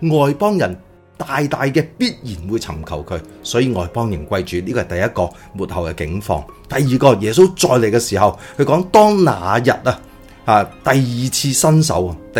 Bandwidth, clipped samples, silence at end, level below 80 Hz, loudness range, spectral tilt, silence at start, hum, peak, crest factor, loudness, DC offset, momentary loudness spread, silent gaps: 17.5 kHz; under 0.1%; 0 s; -40 dBFS; 7 LU; -5 dB/octave; 0 s; none; 0 dBFS; 16 dB; -16 LUFS; under 0.1%; 13 LU; none